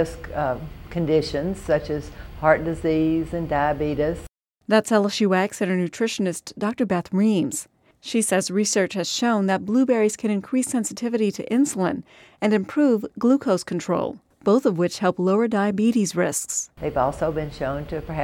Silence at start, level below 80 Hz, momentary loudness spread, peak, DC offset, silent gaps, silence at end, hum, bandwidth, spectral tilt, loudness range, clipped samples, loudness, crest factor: 0 s; -46 dBFS; 8 LU; -4 dBFS; under 0.1%; none; 0 s; none; 16.5 kHz; -5 dB/octave; 2 LU; under 0.1%; -23 LUFS; 20 dB